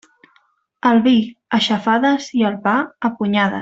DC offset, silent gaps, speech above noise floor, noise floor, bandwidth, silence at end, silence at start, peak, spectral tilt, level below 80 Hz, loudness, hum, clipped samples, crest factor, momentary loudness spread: under 0.1%; none; 43 dB; -60 dBFS; 7.8 kHz; 0 s; 0.85 s; -2 dBFS; -5.5 dB/octave; -60 dBFS; -17 LUFS; none; under 0.1%; 14 dB; 6 LU